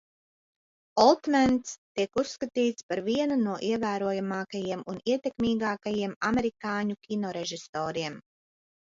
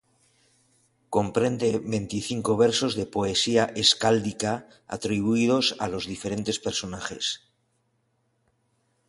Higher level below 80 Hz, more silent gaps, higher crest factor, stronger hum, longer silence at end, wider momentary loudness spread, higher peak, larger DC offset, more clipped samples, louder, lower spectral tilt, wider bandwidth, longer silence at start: about the same, -60 dBFS vs -56 dBFS; first, 1.78-1.95 s, 2.83-2.89 s, 6.16-6.21 s, 7.69-7.73 s vs none; about the same, 22 dB vs 22 dB; neither; second, 0.8 s vs 1.7 s; about the same, 10 LU vs 10 LU; second, -8 dBFS vs -4 dBFS; neither; neither; second, -29 LUFS vs -25 LUFS; about the same, -5 dB/octave vs -4 dB/octave; second, 7.8 kHz vs 11.5 kHz; second, 0.95 s vs 1.1 s